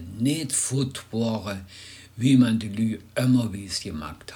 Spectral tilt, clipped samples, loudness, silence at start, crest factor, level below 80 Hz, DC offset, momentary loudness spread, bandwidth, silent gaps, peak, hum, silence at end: -5 dB/octave; under 0.1%; -25 LUFS; 0 s; 18 dB; -54 dBFS; under 0.1%; 16 LU; 19.5 kHz; none; -8 dBFS; none; 0 s